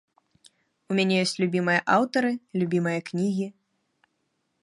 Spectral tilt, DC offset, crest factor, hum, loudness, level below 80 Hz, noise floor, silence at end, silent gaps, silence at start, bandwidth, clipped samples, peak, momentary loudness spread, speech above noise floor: -5.5 dB/octave; under 0.1%; 20 dB; none; -25 LUFS; -74 dBFS; -75 dBFS; 1.1 s; none; 0.9 s; 11.5 kHz; under 0.1%; -6 dBFS; 7 LU; 51 dB